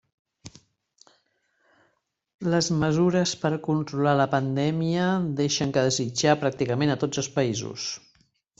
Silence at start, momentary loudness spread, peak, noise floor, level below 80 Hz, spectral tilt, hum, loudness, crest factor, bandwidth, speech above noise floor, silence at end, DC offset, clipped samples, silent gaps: 0.45 s; 6 LU; -6 dBFS; -72 dBFS; -58 dBFS; -5 dB/octave; none; -25 LUFS; 20 dB; 8.2 kHz; 48 dB; 0.6 s; under 0.1%; under 0.1%; 2.34-2.39 s